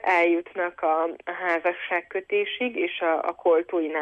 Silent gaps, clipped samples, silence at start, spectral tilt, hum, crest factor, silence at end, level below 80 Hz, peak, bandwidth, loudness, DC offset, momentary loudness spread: none; under 0.1%; 0.05 s; -4.5 dB/octave; none; 14 dB; 0 s; -72 dBFS; -10 dBFS; 7.8 kHz; -25 LUFS; under 0.1%; 6 LU